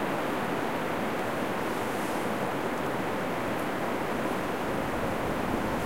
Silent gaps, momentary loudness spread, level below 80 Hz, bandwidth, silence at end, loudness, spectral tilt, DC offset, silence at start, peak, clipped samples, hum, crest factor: none; 1 LU; -52 dBFS; 16 kHz; 0 s; -30 LUFS; -5 dB/octave; 0.8%; 0 s; -14 dBFS; under 0.1%; none; 14 dB